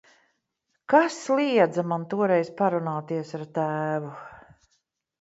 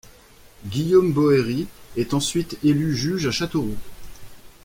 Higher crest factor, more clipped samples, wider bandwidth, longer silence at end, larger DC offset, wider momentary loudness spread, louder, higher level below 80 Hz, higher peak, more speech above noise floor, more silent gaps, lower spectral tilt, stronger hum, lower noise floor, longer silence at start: about the same, 20 dB vs 16 dB; neither; second, 8 kHz vs 16.5 kHz; first, 0.8 s vs 0.15 s; neither; about the same, 11 LU vs 13 LU; second, -25 LUFS vs -22 LUFS; second, -72 dBFS vs -46 dBFS; about the same, -6 dBFS vs -6 dBFS; first, 53 dB vs 28 dB; neither; about the same, -6 dB/octave vs -5.5 dB/octave; neither; first, -78 dBFS vs -49 dBFS; first, 0.9 s vs 0.6 s